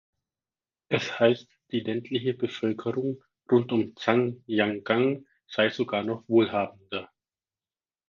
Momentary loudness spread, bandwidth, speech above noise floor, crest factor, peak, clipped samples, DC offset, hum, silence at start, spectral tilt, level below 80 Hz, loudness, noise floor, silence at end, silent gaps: 10 LU; 7.2 kHz; over 64 dB; 22 dB; -6 dBFS; under 0.1%; under 0.1%; none; 0.9 s; -6.5 dB/octave; -68 dBFS; -27 LUFS; under -90 dBFS; 1.05 s; none